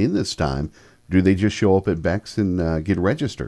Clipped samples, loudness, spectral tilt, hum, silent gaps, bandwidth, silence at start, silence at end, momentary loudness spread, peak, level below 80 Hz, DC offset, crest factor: under 0.1%; -21 LUFS; -6.5 dB/octave; none; none; 11 kHz; 0 s; 0 s; 6 LU; -4 dBFS; -38 dBFS; under 0.1%; 16 dB